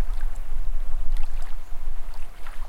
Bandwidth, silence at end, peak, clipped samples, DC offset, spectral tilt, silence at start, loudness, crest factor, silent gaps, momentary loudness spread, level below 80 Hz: 2.9 kHz; 0 s; -8 dBFS; under 0.1%; under 0.1%; -5 dB/octave; 0 s; -36 LUFS; 10 dB; none; 8 LU; -24 dBFS